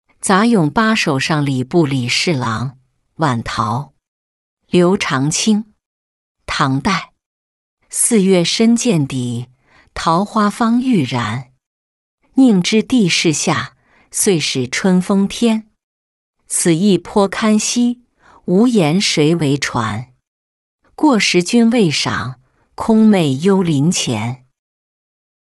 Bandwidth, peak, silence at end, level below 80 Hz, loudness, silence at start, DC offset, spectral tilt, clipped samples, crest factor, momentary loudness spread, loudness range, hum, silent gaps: 12 kHz; -2 dBFS; 1.15 s; -48 dBFS; -15 LUFS; 0.25 s; under 0.1%; -4.5 dB/octave; under 0.1%; 14 dB; 11 LU; 4 LU; none; 4.08-4.57 s, 5.86-6.35 s, 7.26-7.77 s, 11.66-12.18 s, 15.84-16.33 s, 20.27-20.79 s